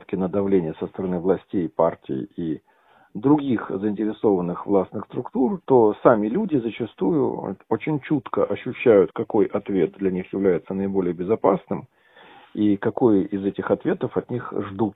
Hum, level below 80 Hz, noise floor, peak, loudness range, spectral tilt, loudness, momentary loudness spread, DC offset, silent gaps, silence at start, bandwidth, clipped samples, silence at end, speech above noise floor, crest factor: none; -56 dBFS; -49 dBFS; -2 dBFS; 3 LU; -11.5 dB/octave; -23 LUFS; 11 LU; under 0.1%; none; 0.1 s; 4 kHz; under 0.1%; 0.05 s; 27 dB; 20 dB